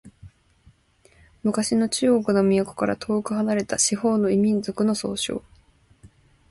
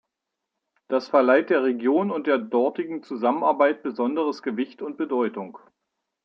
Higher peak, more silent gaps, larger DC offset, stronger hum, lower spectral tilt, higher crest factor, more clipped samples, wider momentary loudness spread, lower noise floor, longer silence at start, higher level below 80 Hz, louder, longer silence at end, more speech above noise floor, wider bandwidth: about the same, -8 dBFS vs -6 dBFS; neither; neither; neither; second, -4.5 dB/octave vs -7 dB/octave; about the same, 16 dB vs 18 dB; neither; second, 7 LU vs 12 LU; second, -58 dBFS vs -83 dBFS; second, 0.05 s vs 0.9 s; first, -56 dBFS vs -80 dBFS; about the same, -22 LUFS vs -23 LUFS; second, 0.45 s vs 0.65 s; second, 36 dB vs 60 dB; first, 11.5 kHz vs 6.6 kHz